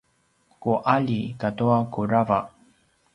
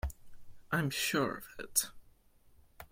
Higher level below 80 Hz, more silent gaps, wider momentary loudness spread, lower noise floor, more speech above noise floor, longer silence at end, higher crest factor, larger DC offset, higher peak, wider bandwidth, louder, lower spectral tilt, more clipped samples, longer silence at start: second, -58 dBFS vs -52 dBFS; neither; second, 7 LU vs 12 LU; about the same, -65 dBFS vs -64 dBFS; first, 43 dB vs 29 dB; first, 0.65 s vs 0.05 s; about the same, 20 dB vs 24 dB; neither; first, -4 dBFS vs -14 dBFS; second, 10.5 kHz vs 16.5 kHz; first, -24 LUFS vs -34 LUFS; first, -9 dB/octave vs -3 dB/octave; neither; first, 0.6 s vs 0.05 s